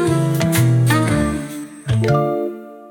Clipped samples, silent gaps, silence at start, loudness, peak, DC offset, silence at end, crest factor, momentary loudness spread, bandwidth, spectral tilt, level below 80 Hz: under 0.1%; none; 0 s; -17 LUFS; -4 dBFS; under 0.1%; 0 s; 14 dB; 14 LU; 18 kHz; -6.5 dB/octave; -40 dBFS